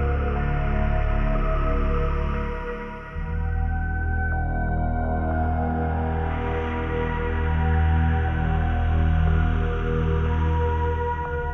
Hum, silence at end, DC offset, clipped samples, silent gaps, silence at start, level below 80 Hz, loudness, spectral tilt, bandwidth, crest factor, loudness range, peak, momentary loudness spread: none; 0 s; under 0.1%; under 0.1%; none; 0 s; -26 dBFS; -25 LUFS; -9.5 dB/octave; 3.8 kHz; 12 dB; 4 LU; -10 dBFS; 6 LU